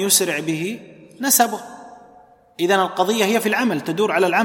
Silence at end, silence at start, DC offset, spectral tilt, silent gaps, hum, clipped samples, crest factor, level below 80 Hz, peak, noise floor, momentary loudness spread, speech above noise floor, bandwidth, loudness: 0 s; 0 s; under 0.1%; -2.5 dB/octave; none; none; under 0.1%; 20 dB; -70 dBFS; 0 dBFS; -49 dBFS; 12 LU; 31 dB; 16.5 kHz; -19 LUFS